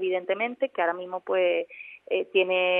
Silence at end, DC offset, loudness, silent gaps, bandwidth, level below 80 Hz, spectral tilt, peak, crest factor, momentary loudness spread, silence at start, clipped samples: 0 s; under 0.1%; -27 LUFS; none; 3.9 kHz; -86 dBFS; -7 dB/octave; -10 dBFS; 16 dB; 9 LU; 0 s; under 0.1%